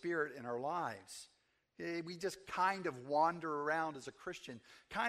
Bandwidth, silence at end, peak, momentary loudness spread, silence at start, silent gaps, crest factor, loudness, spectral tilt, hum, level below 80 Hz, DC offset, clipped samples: 14 kHz; 0 s; -20 dBFS; 16 LU; 0.05 s; none; 20 dB; -40 LUFS; -4.5 dB/octave; none; -78 dBFS; under 0.1%; under 0.1%